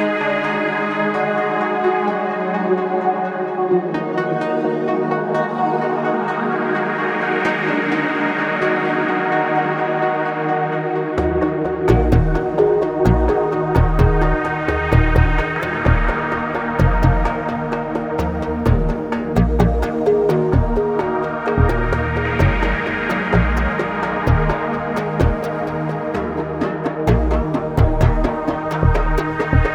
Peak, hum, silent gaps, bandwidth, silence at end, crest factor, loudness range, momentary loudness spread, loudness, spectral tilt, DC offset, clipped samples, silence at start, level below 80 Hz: 0 dBFS; none; none; 9.8 kHz; 0 s; 16 dB; 3 LU; 6 LU; -19 LUFS; -8 dB/octave; under 0.1%; under 0.1%; 0 s; -24 dBFS